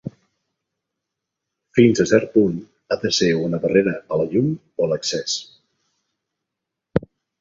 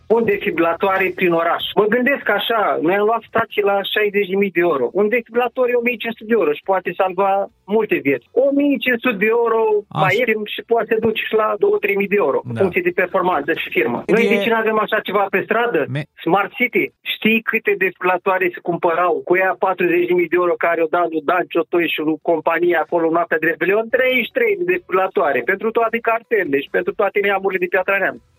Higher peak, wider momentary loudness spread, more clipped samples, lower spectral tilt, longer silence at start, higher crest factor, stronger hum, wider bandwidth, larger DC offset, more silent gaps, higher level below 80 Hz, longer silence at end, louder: about the same, -2 dBFS vs 0 dBFS; first, 10 LU vs 3 LU; neither; second, -5 dB/octave vs -7 dB/octave; about the same, 0.05 s vs 0.1 s; about the same, 20 dB vs 18 dB; neither; second, 7.8 kHz vs 15.5 kHz; neither; neither; first, -52 dBFS vs -62 dBFS; first, 0.4 s vs 0.2 s; second, -20 LUFS vs -17 LUFS